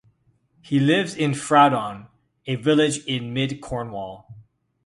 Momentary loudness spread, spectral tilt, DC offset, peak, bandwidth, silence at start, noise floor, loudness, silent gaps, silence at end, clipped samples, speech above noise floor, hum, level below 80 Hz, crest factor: 17 LU; -5 dB/octave; under 0.1%; -2 dBFS; 11.5 kHz; 0.65 s; -63 dBFS; -21 LUFS; none; 0.45 s; under 0.1%; 42 dB; none; -56 dBFS; 20 dB